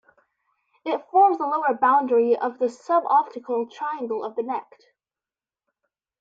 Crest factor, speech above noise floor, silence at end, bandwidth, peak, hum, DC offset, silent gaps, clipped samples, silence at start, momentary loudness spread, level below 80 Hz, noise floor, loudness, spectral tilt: 16 dB; over 68 dB; 1.6 s; 7.8 kHz; -8 dBFS; none; under 0.1%; none; under 0.1%; 0.85 s; 11 LU; -80 dBFS; under -90 dBFS; -23 LUFS; -5.5 dB/octave